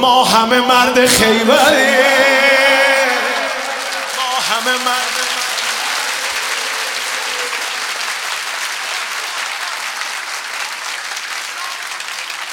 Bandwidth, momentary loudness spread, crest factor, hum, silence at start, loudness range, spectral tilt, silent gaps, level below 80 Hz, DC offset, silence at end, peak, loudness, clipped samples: 19.5 kHz; 12 LU; 16 dB; none; 0 s; 10 LU; -1 dB/octave; none; -52 dBFS; under 0.1%; 0 s; 0 dBFS; -14 LUFS; under 0.1%